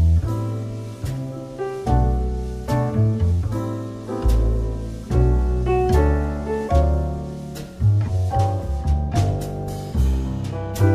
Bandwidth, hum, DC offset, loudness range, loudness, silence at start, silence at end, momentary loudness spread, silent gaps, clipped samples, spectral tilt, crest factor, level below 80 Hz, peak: 14.5 kHz; none; under 0.1%; 2 LU; -22 LUFS; 0 s; 0 s; 10 LU; none; under 0.1%; -8 dB/octave; 14 dB; -24 dBFS; -6 dBFS